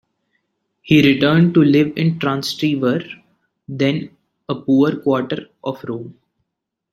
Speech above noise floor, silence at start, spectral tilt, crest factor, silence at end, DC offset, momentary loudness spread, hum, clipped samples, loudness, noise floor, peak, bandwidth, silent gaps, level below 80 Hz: 62 dB; 0.85 s; -7 dB/octave; 16 dB; 0.8 s; under 0.1%; 17 LU; none; under 0.1%; -17 LUFS; -78 dBFS; -2 dBFS; 13.5 kHz; none; -56 dBFS